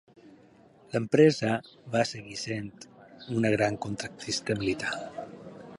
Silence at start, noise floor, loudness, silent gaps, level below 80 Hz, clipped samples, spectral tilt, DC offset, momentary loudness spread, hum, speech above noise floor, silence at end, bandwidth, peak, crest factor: 0.25 s; -57 dBFS; -28 LUFS; none; -62 dBFS; under 0.1%; -5 dB/octave; under 0.1%; 21 LU; none; 29 dB; 0 s; 11.5 kHz; -8 dBFS; 22 dB